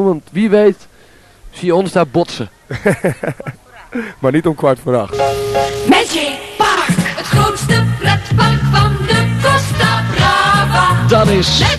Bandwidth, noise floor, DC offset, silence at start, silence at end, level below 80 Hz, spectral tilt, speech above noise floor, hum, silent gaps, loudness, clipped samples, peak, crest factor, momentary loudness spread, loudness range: 13 kHz; -44 dBFS; under 0.1%; 0 s; 0 s; -32 dBFS; -5 dB/octave; 31 dB; none; none; -13 LUFS; under 0.1%; 0 dBFS; 14 dB; 10 LU; 5 LU